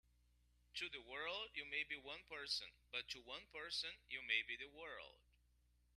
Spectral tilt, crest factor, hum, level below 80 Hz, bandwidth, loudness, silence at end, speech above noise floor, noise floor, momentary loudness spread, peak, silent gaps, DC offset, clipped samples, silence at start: -1 dB/octave; 26 dB; 60 Hz at -75 dBFS; -76 dBFS; 13 kHz; -47 LUFS; 0.8 s; 28 dB; -77 dBFS; 12 LU; -26 dBFS; none; under 0.1%; under 0.1%; 0.75 s